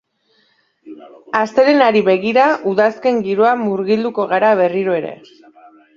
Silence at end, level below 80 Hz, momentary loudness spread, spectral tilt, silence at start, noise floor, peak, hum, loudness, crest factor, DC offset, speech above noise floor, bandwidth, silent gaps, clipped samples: 0.85 s; -64 dBFS; 7 LU; -6.5 dB/octave; 0.85 s; -60 dBFS; 0 dBFS; none; -15 LUFS; 16 dB; under 0.1%; 45 dB; 7.4 kHz; none; under 0.1%